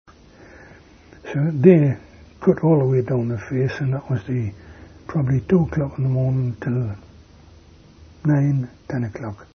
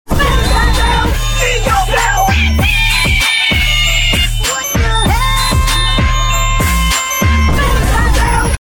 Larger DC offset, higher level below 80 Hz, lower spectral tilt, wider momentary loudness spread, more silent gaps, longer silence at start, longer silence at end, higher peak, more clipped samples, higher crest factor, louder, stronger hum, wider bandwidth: neither; second, -48 dBFS vs -14 dBFS; first, -10 dB/octave vs -3.5 dB/octave; first, 13 LU vs 3 LU; neither; first, 0.6 s vs 0.05 s; about the same, 0.1 s vs 0.1 s; about the same, 0 dBFS vs 0 dBFS; neither; first, 22 dB vs 10 dB; second, -21 LUFS vs -12 LUFS; neither; second, 6.4 kHz vs 18.5 kHz